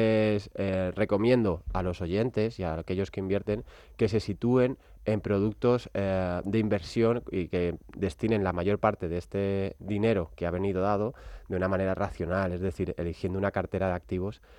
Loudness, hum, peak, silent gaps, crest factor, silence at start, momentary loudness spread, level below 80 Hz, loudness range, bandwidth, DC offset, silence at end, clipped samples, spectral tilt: -29 LUFS; none; -10 dBFS; none; 20 dB; 0 s; 7 LU; -50 dBFS; 2 LU; 11 kHz; under 0.1%; 0.05 s; under 0.1%; -8 dB/octave